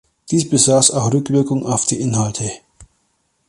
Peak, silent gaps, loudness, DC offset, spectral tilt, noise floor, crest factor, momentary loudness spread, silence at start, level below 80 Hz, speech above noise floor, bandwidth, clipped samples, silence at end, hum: 0 dBFS; none; -16 LUFS; under 0.1%; -4.5 dB/octave; -65 dBFS; 18 dB; 11 LU; 0.3 s; -52 dBFS; 49 dB; 11.5 kHz; under 0.1%; 0.65 s; none